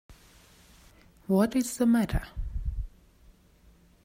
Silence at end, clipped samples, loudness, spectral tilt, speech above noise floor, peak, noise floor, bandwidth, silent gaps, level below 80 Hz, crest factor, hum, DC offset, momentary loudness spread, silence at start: 1.15 s; under 0.1%; -28 LUFS; -6 dB/octave; 34 dB; -12 dBFS; -59 dBFS; 16 kHz; none; -40 dBFS; 18 dB; none; under 0.1%; 17 LU; 0.1 s